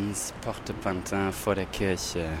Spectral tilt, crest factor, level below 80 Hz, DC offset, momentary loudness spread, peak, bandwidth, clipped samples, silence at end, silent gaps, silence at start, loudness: -4.5 dB/octave; 18 dB; -46 dBFS; under 0.1%; 5 LU; -12 dBFS; 16.5 kHz; under 0.1%; 0 s; none; 0 s; -30 LUFS